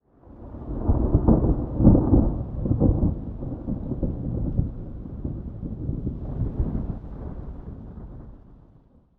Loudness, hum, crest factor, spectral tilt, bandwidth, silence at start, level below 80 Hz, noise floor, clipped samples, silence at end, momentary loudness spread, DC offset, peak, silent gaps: -25 LUFS; none; 22 dB; -14.5 dB/octave; 1.9 kHz; 0.3 s; -30 dBFS; -55 dBFS; under 0.1%; 0.65 s; 20 LU; under 0.1%; -2 dBFS; none